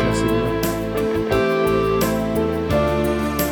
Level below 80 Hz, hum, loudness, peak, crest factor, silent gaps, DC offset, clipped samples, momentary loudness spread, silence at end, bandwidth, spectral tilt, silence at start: -34 dBFS; none; -20 LUFS; -4 dBFS; 14 dB; none; under 0.1%; under 0.1%; 3 LU; 0 s; over 20 kHz; -6 dB/octave; 0 s